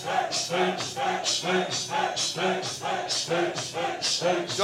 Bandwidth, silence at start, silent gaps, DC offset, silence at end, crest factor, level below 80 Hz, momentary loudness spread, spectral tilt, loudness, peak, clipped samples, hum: 16 kHz; 0 s; none; under 0.1%; 0 s; 16 dB; -72 dBFS; 4 LU; -2.5 dB/octave; -26 LUFS; -10 dBFS; under 0.1%; none